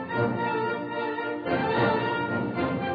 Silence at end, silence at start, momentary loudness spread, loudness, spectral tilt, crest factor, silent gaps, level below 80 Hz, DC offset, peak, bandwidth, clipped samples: 0 s; 0 s; 6 LU; -27 LUFS; -9 dB/octave; 16 dB; none; -58 dBFS; under 0.1%; -12 dBFS; 5 kHz; under 0.1%